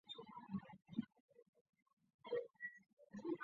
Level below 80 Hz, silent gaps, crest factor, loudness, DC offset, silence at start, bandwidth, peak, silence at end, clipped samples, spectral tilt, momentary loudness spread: -86 dBFS; 1.20-1.28 s, 1.49-1.53 s, 1.61-1.73 s, 1.82-1.86 s, 1.93-1.97 s, 2.14-2.19 s, 2.93-2.97 s; 22 dB; -51 LUFS; under 0.1%; 0.05 s; 7 kHz; -30 dBFS; 0 s; under 0.1%; -4.5 dB/octave; 13 LU